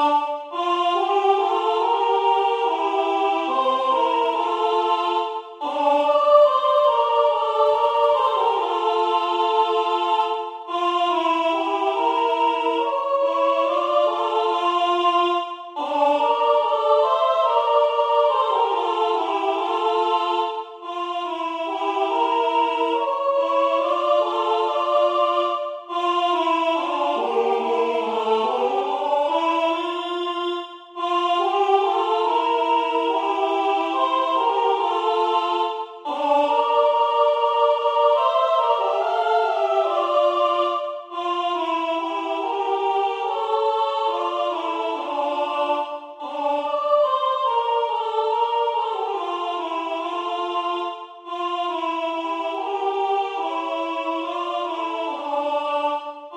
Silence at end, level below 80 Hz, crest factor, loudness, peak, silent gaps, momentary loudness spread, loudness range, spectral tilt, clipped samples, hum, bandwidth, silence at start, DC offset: 0 s; -78 dBFS; 18 dB; -21 LUFS; -4 dBFS; none; 7 LU; 5 LU; -2.5 dB/octave; under 0.1%; none; 9.4 kHz; 0 s; under 0.1%